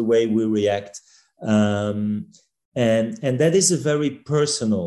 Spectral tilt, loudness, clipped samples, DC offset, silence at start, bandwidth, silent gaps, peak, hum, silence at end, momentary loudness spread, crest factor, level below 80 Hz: -5 dB/octave; -21 LUFS; under 0.1%; under 0.1%; 0 s; 12.5 kHz; 2.65-2.72 s; -6 dBFS; none; 0 s; 12 LU; 14 dB; -56 dBFS